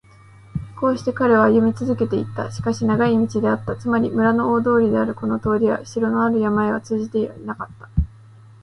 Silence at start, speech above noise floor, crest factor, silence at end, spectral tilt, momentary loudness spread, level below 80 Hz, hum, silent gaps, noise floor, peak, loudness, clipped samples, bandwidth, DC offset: 0.55 s; 27 dB; 16 dB; 0.55 s; -7.5 dB/octave; 10 LU; -38 dBFS; none; none; -46 dBFS; -4 dBFS; -20 LUFS; under 0.1%; 10.5 kHz; under 0.1%